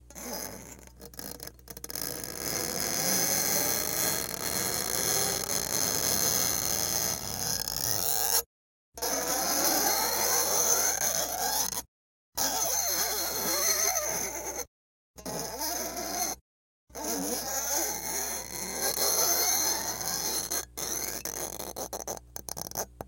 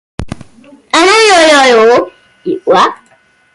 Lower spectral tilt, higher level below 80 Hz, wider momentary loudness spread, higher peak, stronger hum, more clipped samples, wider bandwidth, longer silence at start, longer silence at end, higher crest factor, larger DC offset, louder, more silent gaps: second, -0.5 dB/octave vs -2.5 dB/octave; second, -54 dBFS vs -38 dBFS; second, 14 LU vs 20 LU; second, -8 dBFS vs 0 dBFS; neither; neither; first, 17.5 kHz vs 11.5 kHz; second, 0.05 s vs 0.2 s; second, 0 s vs 0.6 s; first, 22 dB vs 10 dB; neither; second, -28 LUFS vs -7 LUFS; first, 8.46-8.92 s, 11.88-12.32 s, 14.68-15.14 s, 16.41-16.87 s vs none